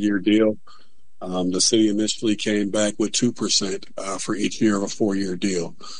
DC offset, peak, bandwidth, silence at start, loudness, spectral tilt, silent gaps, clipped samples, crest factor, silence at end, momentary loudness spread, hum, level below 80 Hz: 2%; -4 dBFS; 10.5 kHz; 0 s; -22 LUFS; -3.5 dB/octave; none; under 0.1%; 18 dB; 0 s; 11 LU; none; -60 dBFS